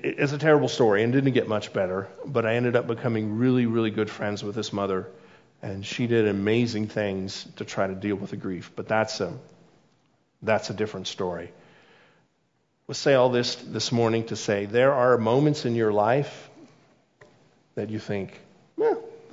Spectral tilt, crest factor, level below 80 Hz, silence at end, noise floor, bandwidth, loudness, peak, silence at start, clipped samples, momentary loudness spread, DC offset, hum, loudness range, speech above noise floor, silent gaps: -6 dB/octave; 20 dB; -70 dBFS; 0.1 s; -70 dBFS; 7.8 kHz; -25 LUFS; -6 dBFS; 0.05 s; under 0.1%; 14 LU; under 0.1%; none; 8 LU; 46 dB; none